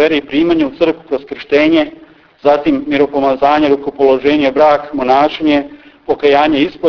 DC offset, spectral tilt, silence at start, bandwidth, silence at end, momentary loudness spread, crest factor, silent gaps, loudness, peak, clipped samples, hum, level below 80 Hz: under 0.1%; -6.5 dB/octave; 0 s; 5.4 kHz; 0 s; 6 LU; 12 dB; none; -12 LUFS; 0 dBFS; under 0.1%; none; -46 dBFS